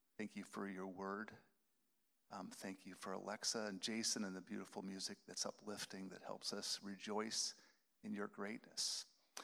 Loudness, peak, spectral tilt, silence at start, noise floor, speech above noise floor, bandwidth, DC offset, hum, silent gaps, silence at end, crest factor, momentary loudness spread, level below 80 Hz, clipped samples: -46 LUFS; -26 dBFS; -2.5 dB/octave; 0.2 s; -83 dBFS; 36 dB; over 20 kHz; under 0.1%; none; none; 0 s; 22 dB; 11 LU; under -90 dBFS; under 0.1%